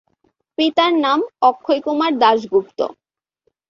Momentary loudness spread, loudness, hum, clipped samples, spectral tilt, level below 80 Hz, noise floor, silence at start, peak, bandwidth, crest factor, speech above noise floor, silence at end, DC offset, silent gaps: 10 LU; -17 LUFS; none; under 0.1%; -4.5 dB/octave; -66 dBFS; -69 dBFS; 0.6 s; -2 dBFS; 7.2 kHz; 16 dB; 52 dB; 0.8 s; under 0.1%; none